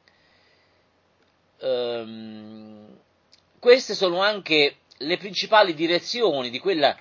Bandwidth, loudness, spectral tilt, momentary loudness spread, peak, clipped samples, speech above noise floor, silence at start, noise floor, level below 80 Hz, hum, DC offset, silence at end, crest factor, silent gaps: 7.4 kHz; -22 LUFS; -3.5 dB/octave; 20 LU; -2 dBFS; under 0.1%; 42 dB; 1.6 s; -64 dBFS; -76 dBFS; none; under 0.1%; 0.05 s; 22 dB; none